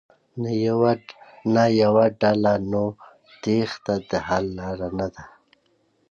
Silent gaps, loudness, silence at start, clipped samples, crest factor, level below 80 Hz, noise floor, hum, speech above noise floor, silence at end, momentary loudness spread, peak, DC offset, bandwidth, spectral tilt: none; -22 LUFS; 0.35 s; under 0.1%; 18 dB; -52 dBFS; -65 dBFS; none; 44 dB; 0.85 s; 12 LU; -6 dBFS; under 0.1%; 7.4 kHz; -7 dB/octave